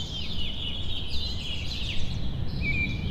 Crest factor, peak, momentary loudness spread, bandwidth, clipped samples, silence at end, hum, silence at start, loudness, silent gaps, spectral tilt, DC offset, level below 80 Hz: 14 dB; -14 dBFS; 5 LU; 8.4 kHz; under 0.1%; 0 s; none; 0 s; -31 LUFS; none; -4.5 dB/octave; under 0.1%; -34 dBFS